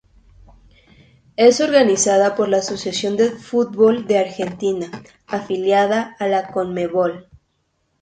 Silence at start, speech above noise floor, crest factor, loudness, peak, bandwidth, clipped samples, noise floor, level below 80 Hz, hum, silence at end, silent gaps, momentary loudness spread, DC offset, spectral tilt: 1.4 s; 50 dB; 18 dB; -18 LUFS; 0 dBFS; 9.4 kHz; under 0.1%; -68 dBFS; -56 dBFS; none; 0.8 s; none; 12 LU; under 0.1%; -4 dB/octave